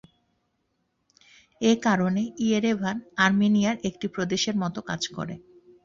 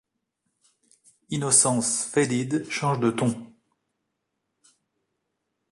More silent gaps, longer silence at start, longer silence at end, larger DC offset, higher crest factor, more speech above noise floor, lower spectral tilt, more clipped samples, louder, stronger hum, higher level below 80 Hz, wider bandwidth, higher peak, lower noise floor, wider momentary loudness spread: neither; first, 1.6 s vs 1.3 s; second, 0.45 s vs 2.25 s; neither; about the same, 22 dB vs 24 dB; second, 50 dB vs 56 dB; about the same, -5 dB/octave vs -4 dB/octave; neither; about the same, -25 LUFS vs -23 LUFS; neither; first, -62 dBFS vs -68 dBFS; second, 7.6 kHz vs 11.5 kHz; about the same, -4 dBFS vs -4 dBFS; second, -74 dBFS vs -80 dBFS; about the same, 9 LU vs 11 LU